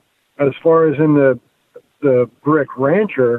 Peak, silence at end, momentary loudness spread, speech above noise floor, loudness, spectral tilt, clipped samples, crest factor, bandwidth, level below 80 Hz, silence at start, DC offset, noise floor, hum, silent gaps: -4 dBFS; 0 s; 7 LU; 32 dB; -15 LUFS; -10.5 dB/octave; under 0.1%; 12 dB; 3.9 kHz; -64 dBFS; 0.4 s; under 0.1%; -46 dBFS; none; none